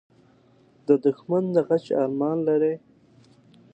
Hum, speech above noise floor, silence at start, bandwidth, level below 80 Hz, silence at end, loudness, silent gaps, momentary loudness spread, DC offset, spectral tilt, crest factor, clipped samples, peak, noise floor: none; 35 dB; 0.9 s; 8.2 kHz; -72 dBFS; 0.95 s; -23 LUFS; none; 5 LU; under 0.1%; -9.5 dB/octave; 20 dB; under 0.1%; -6 dBFS; -58 dBFS